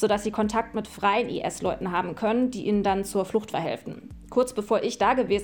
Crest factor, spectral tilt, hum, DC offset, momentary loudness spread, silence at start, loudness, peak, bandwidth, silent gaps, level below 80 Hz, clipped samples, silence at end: 16 dB; -5 dB/octave; none; under 0.1%; 7 LU; 0 s; -26 LUFS; -10 dBFS; 17.5 kHz; none; -50 dBFS; under 0.1%; 0 s